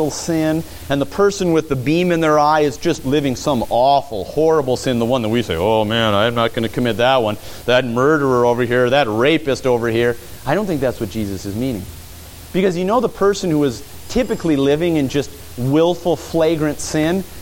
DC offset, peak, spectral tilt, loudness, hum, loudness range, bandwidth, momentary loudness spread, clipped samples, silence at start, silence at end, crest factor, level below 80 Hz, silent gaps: under 0.1%; -2 dBFS; -5.5 dB/octave; -17 LUFS; none; 4 LU; 17 kHz; 9 LU; under 0.1%; 0 s; 0 s; 14 dB; -40 dBFS; none